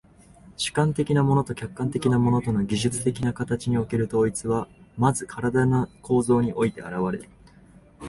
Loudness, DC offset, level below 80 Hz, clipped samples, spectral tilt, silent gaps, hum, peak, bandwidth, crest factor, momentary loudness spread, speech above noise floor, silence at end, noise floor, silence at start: -24 LUFS; under 0.1%; -50 dBFS; under 0.1%; -6 dB/octave; none; none; -6 dBFS; 11.5 kHz; 18 dB; 8 LU; 28 dB; 0 s; -52 dBFS; 0.45 s